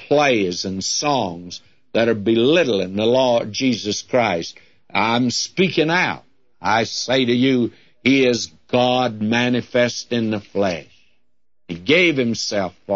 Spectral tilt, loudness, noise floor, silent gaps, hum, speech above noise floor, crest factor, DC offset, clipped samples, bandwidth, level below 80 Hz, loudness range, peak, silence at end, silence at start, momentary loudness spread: -4 dB/octave; -19 LUFS; -76 dBFS; none; none; 57 dB; 16 dB; 0.2%; under 0.1%; 8 kHz; -60 dBFS; 2 LU; -2 dBFS; 0 s; 0 s; 9 LU